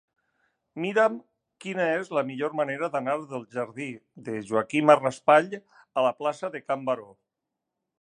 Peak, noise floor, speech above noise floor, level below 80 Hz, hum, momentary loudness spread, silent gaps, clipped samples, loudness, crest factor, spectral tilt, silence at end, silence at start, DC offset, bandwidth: -2 dBFS; -85 dBFS; 59 dB; -78 dBFS; none; 16 LU; none; under 0.1%; -26 LUFS; 24 dB; -5.5 dB/octave; 0.95 s; 0.75 s; under 0.1%; 10 kHz